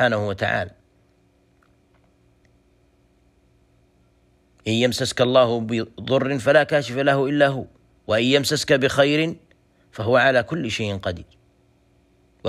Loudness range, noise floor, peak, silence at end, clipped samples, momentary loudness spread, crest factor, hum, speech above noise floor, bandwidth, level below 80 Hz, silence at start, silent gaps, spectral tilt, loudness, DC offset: 10 LU; -60 dBFS; -4 dBFS; 0 s; under 0.1%; 14 LU; 18 dB; none; 40 dB; 15.5 kHz; -56 dBFS; 0 s; none; -5 dB/octave; -20 LUFS; under 0.1%